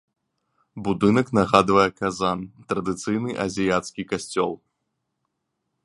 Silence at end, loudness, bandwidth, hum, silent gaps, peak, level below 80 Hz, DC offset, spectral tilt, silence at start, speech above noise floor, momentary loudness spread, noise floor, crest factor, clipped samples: 1.3 s; -23 LUFS; 11.5 kHz; none; none; 0 dBFS; -54 dBFS; under 0.1%; -5.5 dB/octave; 0.75 s; 56 dB; 11 LU; -78 dBFS; 24 dB; under 0.1%